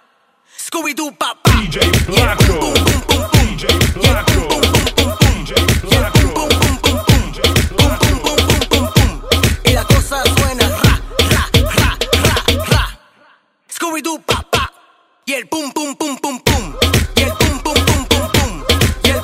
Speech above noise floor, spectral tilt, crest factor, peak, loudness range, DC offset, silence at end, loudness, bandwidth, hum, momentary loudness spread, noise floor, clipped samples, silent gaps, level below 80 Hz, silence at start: 42 dB; -4 dB/octave; 14 dB; 0 dBFS; 5 LU; under 0.1%; 0 s; -14 LUFS; 16.5 kHz; none; 8 LU; -55 dBFS; under 0.1%; none; -22 dBFS; 0.6 s